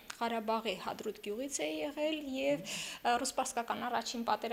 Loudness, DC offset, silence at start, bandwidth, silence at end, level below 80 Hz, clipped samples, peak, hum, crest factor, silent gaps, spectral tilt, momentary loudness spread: -36 LUFS; under 0.1%; 0 s; 16 kHz; 0 s; -70 dBFS; under 0.1%; -18 dBFS; none; 18 dB; none; -2.5 dB/octave; 6 LU